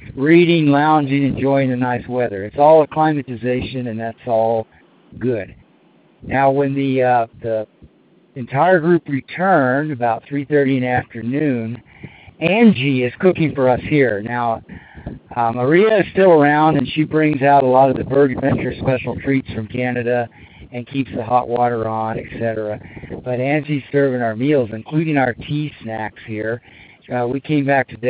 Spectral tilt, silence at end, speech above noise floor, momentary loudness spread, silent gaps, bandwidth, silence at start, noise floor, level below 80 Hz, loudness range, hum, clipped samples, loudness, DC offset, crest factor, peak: -11 dB/octave; 0 s; 36 dB; 13 LU; none; 4.9 kHz; 0 s; -53 dBFS; -48 dBFS; 6 LU; none; under 0.1%; -17 LUFS; under 0.1%; 18 dB; 0 dBFS